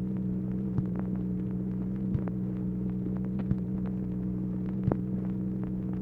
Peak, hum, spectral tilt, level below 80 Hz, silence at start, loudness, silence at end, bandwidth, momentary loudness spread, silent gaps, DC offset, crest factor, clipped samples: -10 dBFS; none; -12 dB/octave; -46 dBFS; 0 s; -32 LUFS; 0 s; 2.9 kHz; 2 LU; none; under 0.1%; 20 dB; under 0.1%